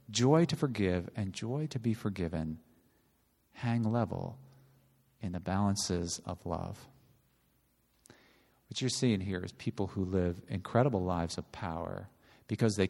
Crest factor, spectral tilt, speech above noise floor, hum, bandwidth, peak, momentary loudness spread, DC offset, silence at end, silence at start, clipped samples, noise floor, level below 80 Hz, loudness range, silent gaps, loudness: 22 dB; -5.5 dB/octave; 39 dB; none; 13 kHz; -12 dBFS; 12 LU; under 0.1%; 0 s; 0.1 s; under 0.1%; -72 dBFS; -58 dBFS; 5 LU; none; -34 LUFS